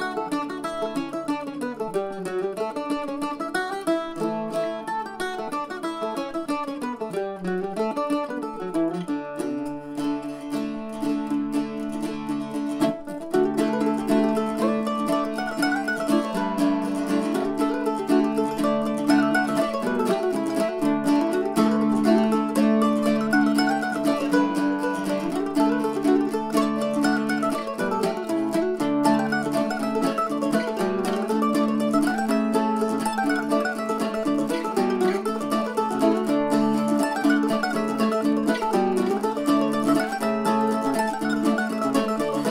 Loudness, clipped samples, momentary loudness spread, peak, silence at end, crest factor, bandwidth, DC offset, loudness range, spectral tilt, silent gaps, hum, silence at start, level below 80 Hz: -24 LUFS; under 0.1%; 8 LU; -6 dBFS; 0 s; 16 dB; 16 kHz; under 0.1%; 7 LU; -5.5 dB/octave; none; none; 0 s; -56 dBFS